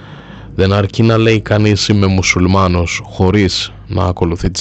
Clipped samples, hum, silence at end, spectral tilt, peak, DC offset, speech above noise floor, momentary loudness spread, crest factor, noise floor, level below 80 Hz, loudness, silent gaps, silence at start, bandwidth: under 0.1%; none; 0 s; -5.5 dB/octave; 0 dBFS; under 0.1%; 20 dB; 8 LU; 12 dB; -32 dBFS; -34 dBFS; -13 LUFS; none; 0 s; 8.4 kHz